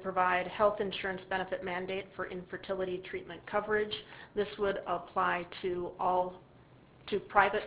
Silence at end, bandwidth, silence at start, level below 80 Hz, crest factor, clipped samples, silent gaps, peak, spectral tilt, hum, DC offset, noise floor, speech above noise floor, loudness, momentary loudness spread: 0 s; 4 kHz; 0 s; -62 dBFS; 26 dB; under 0.1%; none; -8 dBFS; -2.5 dB/octave; none; under 0.1%; -58 dBFS; 25 dB; -34 LUFS; 11 LU